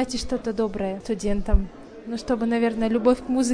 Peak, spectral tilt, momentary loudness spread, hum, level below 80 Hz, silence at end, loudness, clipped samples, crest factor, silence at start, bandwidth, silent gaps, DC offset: -6 dBFS; -5.5 dB/octave; 11 LU; none; -32 dBFS; 0 s; -25 LUFS; under 0.1%; 18 dB; 0 s; 10.5 kHz; none; under 0.1%